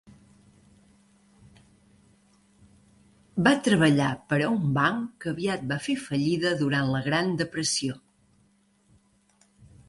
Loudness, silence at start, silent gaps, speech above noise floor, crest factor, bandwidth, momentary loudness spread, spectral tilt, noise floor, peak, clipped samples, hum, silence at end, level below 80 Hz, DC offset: -25 LUFS; 3.35 s; none; 40 dB; 20 dB; 11.5 kHz; 9 LU; -5 dB/octave; -65 dBFS; -8 dBFS; under 0.1%; none; 1.9 s; -60 dBFS; under 0.1%